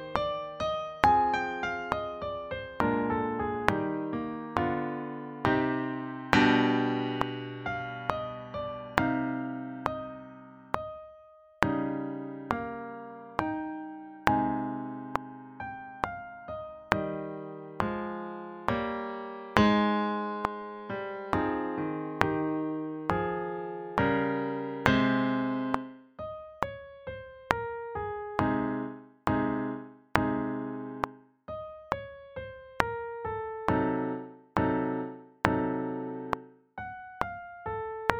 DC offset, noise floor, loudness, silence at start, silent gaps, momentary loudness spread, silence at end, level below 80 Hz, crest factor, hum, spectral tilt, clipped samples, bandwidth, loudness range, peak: under 0.1%; -55 dBFS; -31 LUFS; 0 s; none; 14 LU; 0 s; -54 dBFS; 30 dB; none; -6.5 dB/octave; under 0.1%; 9.6 kHz; 6 LU; 0 dBFS